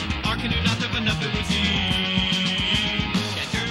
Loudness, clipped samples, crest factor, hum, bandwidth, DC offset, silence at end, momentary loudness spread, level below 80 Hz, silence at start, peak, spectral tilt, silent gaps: -22 LUFS; under 0.1%; 16 dB; none; 16 kHz; under 0.1%; 0 s; 4 LU; -36 dBFS; 0 s; -8 dBFS; -4 dB/octave; none